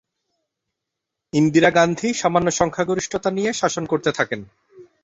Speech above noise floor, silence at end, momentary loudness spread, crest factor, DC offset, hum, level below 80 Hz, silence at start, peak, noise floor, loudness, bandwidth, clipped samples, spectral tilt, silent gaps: 63 dB; 0.2 s; 9 LU; 20 dB; under 0.1%; none; -54 dBFS; 1.35 s; -2 dBFS; -82 dBFS; -20 LUFS; 8 kHz; under 0.1%; -4.5 dB/octave; none